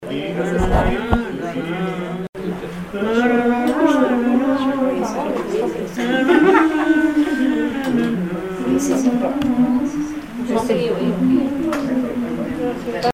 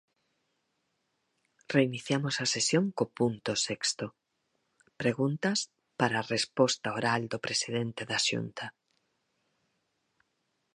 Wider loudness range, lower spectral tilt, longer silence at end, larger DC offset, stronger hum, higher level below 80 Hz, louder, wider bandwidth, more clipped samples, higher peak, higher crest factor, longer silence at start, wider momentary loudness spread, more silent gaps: about the same, 3 LU vs 3 LU; first, -6 dB/octave vs -3.5 dB/octave; second, 0 s vs 2.05 s; first, 0.2% vs under 0.1%; neither; first, -34 dBFS vs -72 dBFS; first, -19 LUFS vs -30 LUFS; first, 15.5 kHz vs 11.5 kHz; neither; first, 0 dBFS vs -10 dBFS; second, 18 dB vs 24 dB; second, 0 s vs 1.7 s; about the same, 9 LU vs 7 LU; first, 2.29-2.33 s vs none